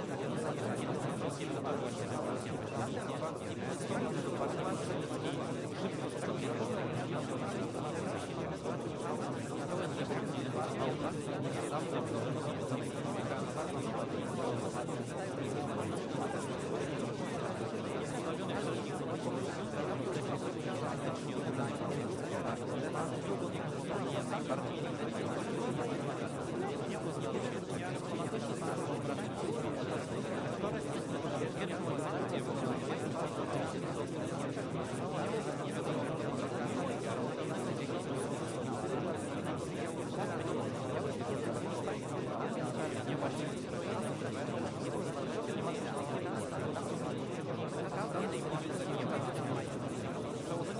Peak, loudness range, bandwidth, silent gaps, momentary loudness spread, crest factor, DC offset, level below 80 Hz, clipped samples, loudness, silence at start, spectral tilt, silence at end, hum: -22 dBFS; 1 LU; 11.5 kHz; none; 2 LU; 16 dB; under 0.1%; -68 dBFS; under 0.1%; -38 LUFS; 0 s; -6 dB/octave; 0 s; none